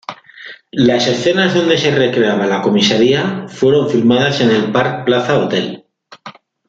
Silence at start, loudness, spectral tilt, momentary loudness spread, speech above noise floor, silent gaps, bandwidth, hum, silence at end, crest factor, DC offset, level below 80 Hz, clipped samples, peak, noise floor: 0.1 s; -13 LUFS; -5.5 dB/octave; 12 LU; 24 dB; none; 7.8 kHz; none; 0.35 s; 14 dB; under 0.1%; -54 dBFS; under 0.1%; 0 dBFS; -37 dBFS